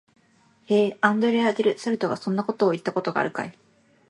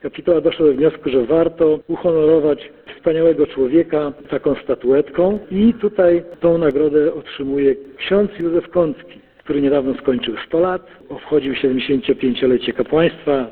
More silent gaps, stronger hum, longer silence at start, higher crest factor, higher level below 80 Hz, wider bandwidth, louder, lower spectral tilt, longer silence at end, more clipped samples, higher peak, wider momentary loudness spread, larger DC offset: neither; neither; first, 0.7 s vs 0.05 s; first, 22 dB vs 14 dB; second, -72 dBFS vs -46 dBFS; first, 11 kHz vs 4.4 kHz; second, -24 LUFS vs -17 LUFS; second, -6 dB/octave vs -10 dB/octave; first, 0.6 s vs 0 s; neither; about the same, -2 dBFS vs -2 dBFS; about the same, 6 LU vs 7 LU; neither